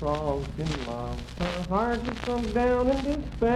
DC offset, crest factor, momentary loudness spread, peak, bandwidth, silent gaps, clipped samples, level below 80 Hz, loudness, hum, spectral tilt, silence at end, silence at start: under 0.1%; 14 dB; 8 LU; -12 dBFS; 12.5 kHz; none; under 0.1%; -38 dBFS; -28 LUFS; none; -6.5 dB/octave; 0 s; 0 s